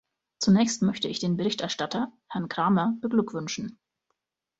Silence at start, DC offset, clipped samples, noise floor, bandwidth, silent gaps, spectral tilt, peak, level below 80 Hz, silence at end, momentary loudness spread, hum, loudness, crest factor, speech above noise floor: 0.4 s; under 0.1%; under 0.1%; -80 dBFS; 8 kHz; none; -5 dB/octave; -10 dBFS; -66 dBFS; 0.9 s; 11 LU; none; -27 LUFS; 16 dB; 54 dB